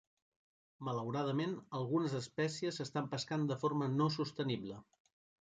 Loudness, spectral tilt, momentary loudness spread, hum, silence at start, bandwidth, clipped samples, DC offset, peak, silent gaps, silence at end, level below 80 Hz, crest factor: -38 LUFS; -6 dB/octave; 7 LU; none; 0.8 s; 9.4 kHz; under 0.1%; under 0.1%; -22 dBFS; none; 0.6 s; -76 dBFS; 16 dB